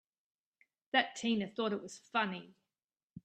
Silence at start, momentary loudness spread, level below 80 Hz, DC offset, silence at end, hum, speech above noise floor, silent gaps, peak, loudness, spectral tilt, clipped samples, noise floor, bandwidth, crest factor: 0.95 s; 7 LU; -82 dBFS; under 0.1%; 0.05 s; none; over 54 dB; 2.84-2.89 s, 3.03-3.08 s; -14 dBFS; -35 LUFS; -4 dB/octave; under 0.1%; under -90 dBFS; 9.2 kHz; 24 dB